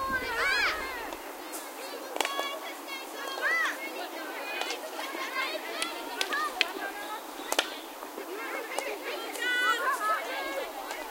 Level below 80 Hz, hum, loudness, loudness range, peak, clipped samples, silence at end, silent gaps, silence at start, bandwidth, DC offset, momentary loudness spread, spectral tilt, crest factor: -62 dBFS; none; -32 LUFS; 2 LU; -4 dBFS; under 0.1%; 0 s; none; 0 s; 17 kHz; under 0.1%; 11 LU; -0.5 dB/octave; 30 dB